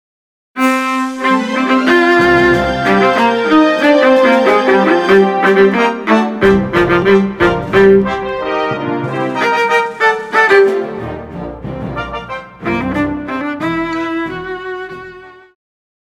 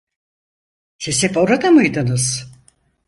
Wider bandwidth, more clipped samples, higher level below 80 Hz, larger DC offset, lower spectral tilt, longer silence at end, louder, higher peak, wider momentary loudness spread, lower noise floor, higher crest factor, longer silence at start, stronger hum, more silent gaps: first, 15.5 kHz vs 11.5 kHz; neither; first, -38 dBFS vs -52 dBFS; neither; first, -6 dB/octave vs -4.5 dB/octave; first, 0.75 s vs 0.6 s; first, -12 LUFS vs -16 LUFS; about the same, 0 dBFS vs -2 dBFS; first, 15 LU vs 11 LU; second, -35 dBFS vs -56 dBFS; about the same, 12 dB vs 16 dB; second, 0.55 s vs 1 s; neither; neither